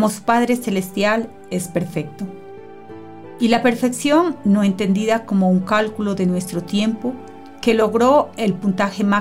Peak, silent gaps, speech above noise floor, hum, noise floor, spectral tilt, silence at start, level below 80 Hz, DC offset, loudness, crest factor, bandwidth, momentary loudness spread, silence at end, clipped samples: -4 dBFS; none; 20 dB; none; -38 dBFS; -6 dB/octave; 0 s; -54 dBFS; under 0.1%; -19 LUFS; 16 dB; 16 kHz; 19 LU; 0 s; under 0.1%